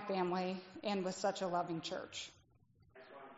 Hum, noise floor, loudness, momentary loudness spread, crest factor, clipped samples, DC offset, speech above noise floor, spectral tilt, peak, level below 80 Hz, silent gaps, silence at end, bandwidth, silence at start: none; -70 dBFS; -40 LUFS; 13 LU; 18 dB; under 0.1%; under 0.1%; 30 dB; -4 dB/octave; -24 dBFS; -80 dBFS; none; 0 s; 8 kHz; 0 s